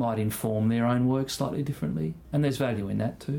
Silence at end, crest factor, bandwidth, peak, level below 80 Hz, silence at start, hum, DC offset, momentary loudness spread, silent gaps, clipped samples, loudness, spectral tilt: 0 s; 14 dB; 18 kHz; -14 dBFS; -54 dBFS; 0 s; none; under 0.1%; 6 LU; none; under 0.1%; -28 LUFS; -6.5 dB/octave